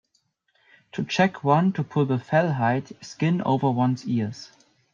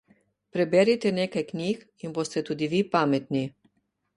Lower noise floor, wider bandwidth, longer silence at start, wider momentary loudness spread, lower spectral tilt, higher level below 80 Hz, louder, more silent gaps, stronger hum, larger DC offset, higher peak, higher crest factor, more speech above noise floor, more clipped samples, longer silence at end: about the same, -70 dBFS vs -72 dBFS; second, 7.4 kHz vs 11 kHz; first, 0.95 s vs 0.55 s; about the same, 12 LU vs 12 LU; about the same, -7 dB/octave vs -6 dB/octave; about the same, -68 dBFS vs -68 dBFS; about the same, -24 LUFS vs -26 LUFS; neither; neither; neither; first, -4 dBFS vs -8 dBFS; about the same, 20 dB vs 20 dB; about the same, 47 dB vs 46 dB; neither; second, 0.45 s vs 0.7 s